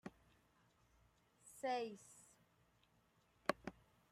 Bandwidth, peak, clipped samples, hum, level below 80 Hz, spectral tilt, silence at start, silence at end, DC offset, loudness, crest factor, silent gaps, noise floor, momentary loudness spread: 16 kHz; -20 dBFS; under 0.1%; none; -80 dBFS; -4 dB/octave; 0.05 s; 0.4 s; under 0.1%; -46 LUFS; 32 dB; none; -77 dBFS; 20 LU